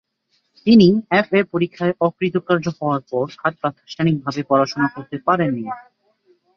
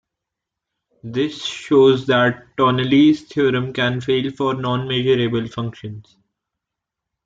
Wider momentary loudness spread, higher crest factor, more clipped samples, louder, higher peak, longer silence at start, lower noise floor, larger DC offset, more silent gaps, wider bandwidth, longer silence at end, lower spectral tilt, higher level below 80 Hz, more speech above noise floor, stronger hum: second, 11 LU vs 14 LU; about the same, 18 dB vs 16 dB; neither; about the same, -19 LUFS vs -18 LUFS; about the same, -2 dBFS vs -4 dBFS; second, 0.65 s vs 1.05 s; second, -68 dBFS vs -83 dBFS; neither; neither; second, 6.8 kHz vs 7.8 kHz; second, 0.75 s vs 1.25 s; about the same, -7.5 dB/octave vs -6.5 dB/octave; about the same, -58 dBFS vs -56 dBFS; second, 49 dB vs 65 dB; neither